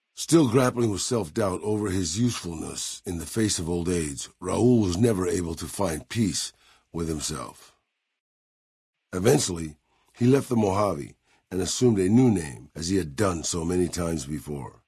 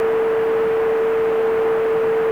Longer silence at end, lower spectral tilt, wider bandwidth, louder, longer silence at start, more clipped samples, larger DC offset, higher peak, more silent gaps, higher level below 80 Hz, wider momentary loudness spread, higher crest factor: first, 0.15 s vs 0 s; about the same, -5 dB/octave vs -6 dB/octave; first, 12 kHz vs 5.6 kHz; second, -25 LUFS vs -18 LUFS; first, 0.15 s vs 0 s; neither; second, under 0.1% vs 0.2%; about the same, -8 dBFS vs -10 dBFS; first, 8.20-8.93 s vs none; about the same, -52 dBFS vs -54 dBFS; first, 13 LU vs 0 LU; first, 18 dB vs 8 dB